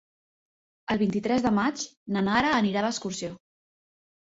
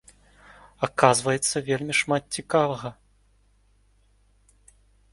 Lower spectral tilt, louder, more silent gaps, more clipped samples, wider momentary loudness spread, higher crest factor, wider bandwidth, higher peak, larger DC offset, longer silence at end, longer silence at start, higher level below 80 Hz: first, -5 dB/octave vs -3.5 dB/octave; about the same, -26 LUFS vs -24 LUFS; first, 1.97-2.06 s vs none; neither; about the same, 12 LU vs 11 LU; second, 20 dB vs 26 dB; second, 7.8 kHz vs 12 kHz; second, -8 dBFS vs 0 dBFS; neither; second, 0.95 s vs 2.2 s; about the same, 0.9 s vs 0.8 s; about the same, -58 dBFS vs -60 dBFS